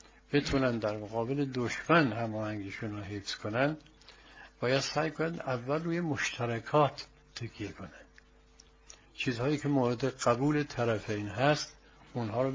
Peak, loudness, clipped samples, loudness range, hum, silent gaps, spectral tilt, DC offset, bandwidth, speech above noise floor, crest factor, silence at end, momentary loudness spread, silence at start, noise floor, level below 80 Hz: -10 dBFS; -32 LUFS; under 0.1%; 4 LU; none; none; -5.5 dB/octave; under 0.1%; 7.6 kHz; 29 dB; 24 dB; 0 s; 14 LU; 0.3 s; -60 dBFS; -58 dBFS